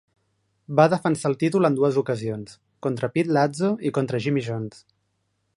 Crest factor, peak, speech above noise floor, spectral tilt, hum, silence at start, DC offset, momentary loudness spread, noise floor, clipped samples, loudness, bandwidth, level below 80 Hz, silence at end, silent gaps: 22 dB; -2 dBFS; 50 dB; -7 dB/octave; none; 0.7 s; under 0.1%; 12 LU; -73 dBFS; under 0.1%; -23 LUFS; 11.5 kHz; -66 dBFS; 0.9 s; none